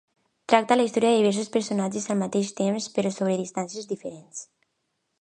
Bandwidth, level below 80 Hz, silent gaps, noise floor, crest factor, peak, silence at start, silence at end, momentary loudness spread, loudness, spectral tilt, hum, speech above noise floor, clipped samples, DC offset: 10 kHz; -74 dBFS; none; -77 dBFS; 24 dB; -2 dBFS; 0.5 s; 0.8 s; 16 LU; -25 LUFS; -5 dB/octave; none; 52 dB; under 0.1%; under 0.1%